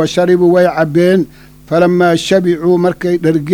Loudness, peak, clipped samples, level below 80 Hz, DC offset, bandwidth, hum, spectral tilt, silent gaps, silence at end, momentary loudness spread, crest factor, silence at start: -11 LUFS; 0 dBFS; under 0.1%; -46 dBFS; under 0.1%; 15.5 kHz; none; -6.5 dB/octave; none; 0 s; 5 LU; 10 dB; 0 s